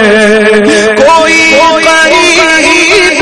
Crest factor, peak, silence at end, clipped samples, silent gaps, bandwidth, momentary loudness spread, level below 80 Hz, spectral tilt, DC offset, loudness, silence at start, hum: 4 dB; 0 dBFS; 0 s; 6%; none; 12 kHz; 2 LU; -36 dBFS; -2.5 dB/octave; 1%; -3 LUFS; 0 s; none